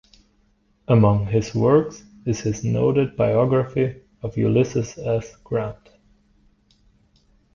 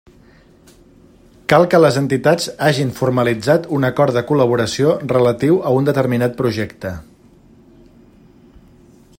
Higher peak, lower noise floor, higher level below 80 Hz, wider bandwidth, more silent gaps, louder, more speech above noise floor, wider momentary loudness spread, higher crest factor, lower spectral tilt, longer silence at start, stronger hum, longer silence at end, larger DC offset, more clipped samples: second, -4 dBFS vs 0 dBFS; first, -62 dBFS vs -48 dBFS; about the same, -48 dBFS vs -52 dBFS; second, 7.2 kHz vs 16.5 kHz; neither; second, -21 LUFS vs -16 LUFS; first, 42 dB vs 32 dB; first, 12 LU vs 8 LU; about the same, 18 dB vs 18 dB; first, -7.5 dB/octave vs -6 dB/octave; second, 0.9 s vs 1.5 s; neither; second, 1.8 s vs 2.15 s; neither; neither